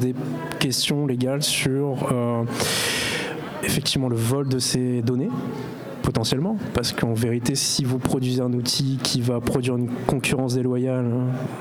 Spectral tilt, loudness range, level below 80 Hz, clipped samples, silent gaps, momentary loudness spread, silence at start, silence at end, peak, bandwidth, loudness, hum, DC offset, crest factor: -4.5 dB/octave; 1 LU; -48 dBFS; under 0.1%; none; 5 LU; 0 s; 0 s; 0 dBFS; 19 kHz; -23 LUFS; none; under 0.1%; 22 dB